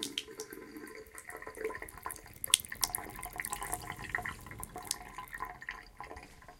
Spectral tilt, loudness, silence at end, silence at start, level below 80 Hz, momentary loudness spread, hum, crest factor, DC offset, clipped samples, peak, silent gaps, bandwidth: -0.5 dB/octave; -38 LUFS; 0 s; 0 s; -58 dBFS; 18 LU; none; 40 dB; under 0.1%; under 0.1%; 0 dBFS; none; 17 kHz